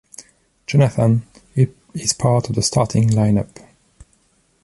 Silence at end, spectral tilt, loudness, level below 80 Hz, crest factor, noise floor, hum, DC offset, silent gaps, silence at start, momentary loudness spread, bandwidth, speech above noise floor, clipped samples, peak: 1.2 s; -6 dB/octave; -18 LUFS; -46 dBFS; 16 dB; -60 dBFS; none; under 0.1%; none; 0.7 s; 7 LU; 11.5 kHz; 44 dB; under 0.1%; -2 dBFS